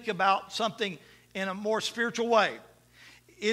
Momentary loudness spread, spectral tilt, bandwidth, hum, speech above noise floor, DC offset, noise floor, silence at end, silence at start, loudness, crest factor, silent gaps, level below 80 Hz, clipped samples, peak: 12 LU; -3.5 dB/octave; 15 kHz; 60 Hz at -60 dBFS; 27 dB; under 0.1%; -56 dBFS; 0 s; 0 s; -29 LUFS; 20 dB; none; -72 dBFS; under 0.1%; -10 dBFS